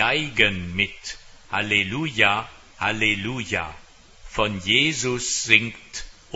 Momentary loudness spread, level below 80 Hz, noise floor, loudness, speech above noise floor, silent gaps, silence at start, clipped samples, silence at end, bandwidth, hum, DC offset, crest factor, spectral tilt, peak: 18 LU; -46 dBFS; -45 dBFS; -21 LUFS; 22 dB; none; 0 s; under 0.1%; 0 s; 8.2 kHz; none; under 0.1%; 24 dB; -2.5 dB/octave; 0 dBFS